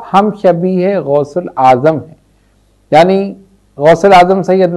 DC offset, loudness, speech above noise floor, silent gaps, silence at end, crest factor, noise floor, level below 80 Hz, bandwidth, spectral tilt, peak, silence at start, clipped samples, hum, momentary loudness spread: under 0.1%; -10 LUFS; 42 dB; none; 0 s; 10 dB; -51 dBFS; -46 dBFS; 12 kHz; -7 dB/octave; 0 dBFS; 0 s; 1%; none; 9 LU